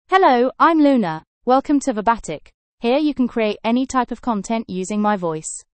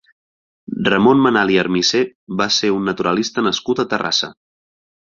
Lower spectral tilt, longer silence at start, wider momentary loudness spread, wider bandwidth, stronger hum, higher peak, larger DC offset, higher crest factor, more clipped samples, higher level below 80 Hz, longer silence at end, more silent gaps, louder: about the same, -5 dB/octave vs -4 dB/octave; second, 0.1 s vs 0.7 s; first, 11 LU vs 8 LU; first, 8.8 kHz vs 7.4 kHz; neither; about the same, -2 dBFS vs 0 dBFS; neither; about the same, 16 dB vs 18 dB; neither; first, -50 dBFS vs -56 dBFS; second, 0.1 s vs 0.75 s; first, 1.27-1.41 s, 2.54-2.78 s vs 2.15-2.27 s; second, -19 LUFS vs -16 LUFS